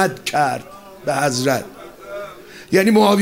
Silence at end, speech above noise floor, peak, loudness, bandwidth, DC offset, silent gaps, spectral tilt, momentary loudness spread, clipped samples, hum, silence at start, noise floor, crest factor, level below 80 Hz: 0 s; 20 dB; -2 dBFS; -18 LUFS; 16 kHz; 0.2%; none; -4.5 dB/octave; 23 LU; under 0.1%; none; 0 s; -37 dBFS; 16 dB; -58 dBFS